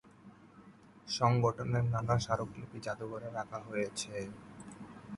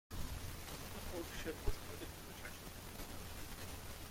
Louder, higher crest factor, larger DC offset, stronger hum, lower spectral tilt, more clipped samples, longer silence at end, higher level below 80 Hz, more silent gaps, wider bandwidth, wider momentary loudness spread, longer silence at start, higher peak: first, -35 LUFS vs -48 LUFS; about the same, 20 dB vs 22 dB; neither; neither; first, -5.5 dB/octave vs -4 dB/octave; neither; about the same, 0 s vs 0 s; second, -60 dBFS vs -52 dBFS; neither; second, 11.5 kHz vs 16.5 kHz; first, 20 LU vs 5 LU; about the same, 0.05 s vs 0.1 s; first, -16 dBFS vs -24 dBFS